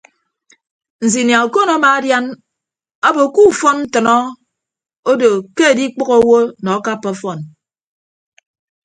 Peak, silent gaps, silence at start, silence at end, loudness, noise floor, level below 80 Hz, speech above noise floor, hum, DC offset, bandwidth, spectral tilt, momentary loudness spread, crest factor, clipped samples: 0 dBFS; 2.95-3.02 s, 4.99-5.03 s; 1 s; 1.35 s; -13 LUFS; -80 dBFS; -58 dBFS; 68 dB; none; under 0.1%; 9.6 kHz; -4 dB/octave; 12 LU; 16 dB; under 0.1%